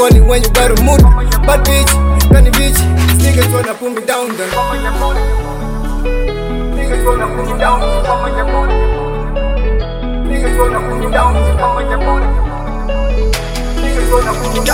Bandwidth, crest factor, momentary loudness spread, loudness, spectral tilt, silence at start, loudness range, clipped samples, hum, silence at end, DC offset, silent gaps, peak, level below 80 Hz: 16.5 kHz; 10 dB; 10 LU; -13 LUFS; -5 dB/octave; 0 s; 7 LU; under 0.1%; none; 0 s; 0.4%; none; 0 dBFS; -14 dBFS